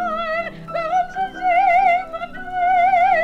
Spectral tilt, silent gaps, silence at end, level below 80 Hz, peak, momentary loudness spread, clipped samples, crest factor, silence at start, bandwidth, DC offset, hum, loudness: -4.5 dB/octave; none; 0 s; -46 dBFS; -6 dBFS; 12 LU; under 0.1%; 12 dB; 0 s; 7.2 kHz; under 0.1%; none; -18 LUFS